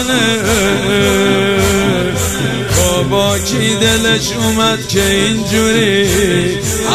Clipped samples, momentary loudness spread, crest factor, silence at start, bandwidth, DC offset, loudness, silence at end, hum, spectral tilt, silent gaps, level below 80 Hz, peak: under 0.1%; 3 LU; 12 dB; 0 s; 16 kHz; 1%; -12 LUFS; 0 s; none; -4 dB/octave; none; -32 dBFS; 0 dBFS